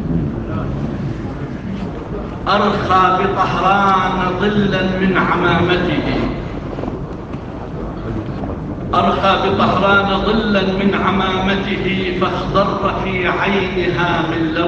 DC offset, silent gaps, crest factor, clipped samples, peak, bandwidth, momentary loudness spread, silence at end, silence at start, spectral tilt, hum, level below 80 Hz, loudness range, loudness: under 0.1%; none; 14 dB; under 0.1%; -2 dBFS; 7.8 kHz; 12 LU; 0 s; 0 s; -7 dB/octave; none; -32 dBFS; 5 LU; -16 LUFS